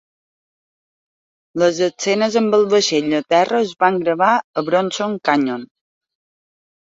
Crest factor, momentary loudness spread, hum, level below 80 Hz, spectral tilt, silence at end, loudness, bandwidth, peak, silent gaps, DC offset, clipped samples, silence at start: 18 dB; 5 LU; none; -64 dBFS; -4 dB/octave; 1.15 s; -17 LUFS; 7.8 kHz; -2 dBFS; 4.44-4.53 s; under 0.1%; under 0.1%; 1.55 s